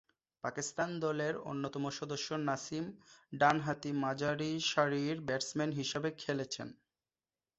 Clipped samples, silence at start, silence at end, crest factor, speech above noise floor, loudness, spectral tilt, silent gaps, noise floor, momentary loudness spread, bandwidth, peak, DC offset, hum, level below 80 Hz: under 0.1%; 0.45 s; 0.85 s; 24 dB; over 54 dB; -36 LUFS; -4 dB/octave; none; under -90 dBFS; 10 LU; 8 kHz; -14 dBFS; under 0.1%; none; -74 dBFS